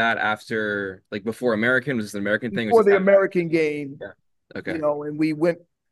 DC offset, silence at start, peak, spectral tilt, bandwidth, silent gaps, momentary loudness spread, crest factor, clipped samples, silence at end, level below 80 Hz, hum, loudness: under 0.1%; 0 s; -4 dBFS; -6.5 dB/octave; 12.5 kHz; none; 16 LU; 18 dB; under 0.1%; 0.35 s; -70 dBFS; none; -22 LUFS